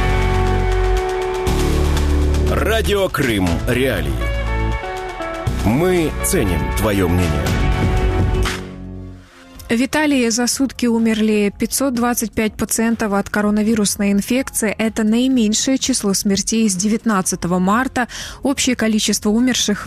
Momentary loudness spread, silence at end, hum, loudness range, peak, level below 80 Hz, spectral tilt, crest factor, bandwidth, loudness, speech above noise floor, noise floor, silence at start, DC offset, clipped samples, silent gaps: 6 LU; 0 s; none; 2 LU; -4 dBFS; -24 dBFS; -4.5 dB/octave; 12 dB; 15 kHz; -17 LUFS; 22 dB; -39 dBFS; 0 s; under 0.1%; under 0.1%; none